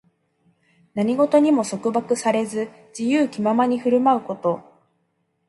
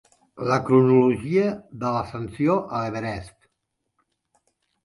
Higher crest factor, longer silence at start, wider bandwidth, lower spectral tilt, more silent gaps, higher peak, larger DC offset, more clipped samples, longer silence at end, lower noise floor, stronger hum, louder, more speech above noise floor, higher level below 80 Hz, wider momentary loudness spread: about the same, 18 dB vs 18 dB; first, 0.95 s vs 0.35 s; about the same, 11.5 kHz vs 11.5 kHz; second, -5.5 dB/octave vs -8 dB/octave; neither; about the same, -4 dBFS vs -6 dBFS; neither; neither; second, 0.9 s vs 1.55 s; second, -70 dBFS vs -78 dBFS; neither; about the same, -21 LUFS vs -22 LUFS; second, 50 dB vs 56 dB; second, -70 dBFS vs -54 dBFS; second, 11 LU vs 14 LU